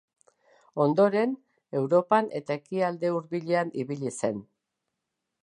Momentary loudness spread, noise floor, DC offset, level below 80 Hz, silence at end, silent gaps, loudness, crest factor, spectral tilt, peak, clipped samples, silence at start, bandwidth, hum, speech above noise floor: 11 LU; -84 dBFS; under 0.1%; -76 dBFS; 1 s; none; -27 LUFS; 20 dB; -6.5 dB/octave; -8 dBFS; under 0.1%; 0.75 s; 11 kHz; none; 58 dB